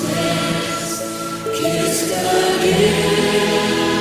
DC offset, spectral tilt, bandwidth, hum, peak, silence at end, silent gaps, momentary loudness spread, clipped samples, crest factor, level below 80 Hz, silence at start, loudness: under 0.1%; -4 dB/octave; 16 kHz; none; -2 dBFS; 0 s; none; 8 LU; under 0.1%; 16 dB; -44 dBFS; 0 s; -17 LUFS